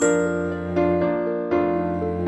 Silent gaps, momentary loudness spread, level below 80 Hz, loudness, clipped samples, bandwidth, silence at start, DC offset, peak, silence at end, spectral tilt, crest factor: none; 4 LU; -48 dBFS; -23 LUFS; under 0.1%; 8.6 kHz; 0 s; under 0.1%; -8 dBFS; 0 s; -6.5 dB/octave; 14 dB